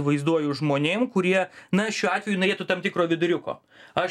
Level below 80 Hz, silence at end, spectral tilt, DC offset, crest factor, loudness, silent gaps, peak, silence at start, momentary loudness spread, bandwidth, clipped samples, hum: -68 dBFS; 0 s; -5.5 dB/octave; under 0.1%; 18 dB; -24 LUFS; none; -6 dBFS; 0 s; 5 LU; 12 kHz; under 0.1%; none